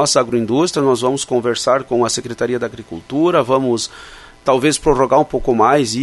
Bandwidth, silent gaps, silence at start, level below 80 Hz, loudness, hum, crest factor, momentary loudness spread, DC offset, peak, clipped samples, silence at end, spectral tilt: 12 kHz; none; 0 s; -40 dBFS; -16 LUFS; none; 16 dB; 9 LU; under 0.1%; 0 dBFS; under 0.1%; 0 s; -4.5 dB/octave